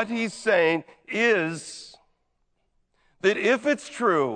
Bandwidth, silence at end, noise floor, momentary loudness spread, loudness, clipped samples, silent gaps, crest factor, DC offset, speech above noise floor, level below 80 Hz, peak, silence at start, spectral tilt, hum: 9.4 kHz; 0 s; -72 dBFS; 11 LU; -24 LUFS; under 0.1%; none; 16 dB; under 0.1%; 48 dB; -72 dBFS; -8 dBFS; 0 s; -4.5 dB/octave; none